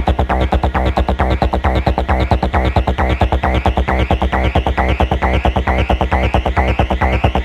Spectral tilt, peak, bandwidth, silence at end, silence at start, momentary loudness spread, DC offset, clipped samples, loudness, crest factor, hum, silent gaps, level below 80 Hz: -7.5 dB/octave; 0 dBFS; 7.6 kHz; 0 s; 0 s; 1 LU; under 0.1%; under 0.1%; -16 LUFS; 14 dB; none; none; -18 dBFS